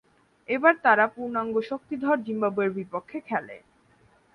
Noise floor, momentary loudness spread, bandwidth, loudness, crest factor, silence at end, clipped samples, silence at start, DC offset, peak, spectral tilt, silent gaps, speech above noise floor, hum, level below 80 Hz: -61 dBFS; 13 LU; 9.6 kHz; -25 LUFS; 22 dB; 0.75 s; under 0.1%; 0.5 s; under 0.1%; -4 dBFS; -7.5 dB/octave; none; 36 dB; none; -70 dBFS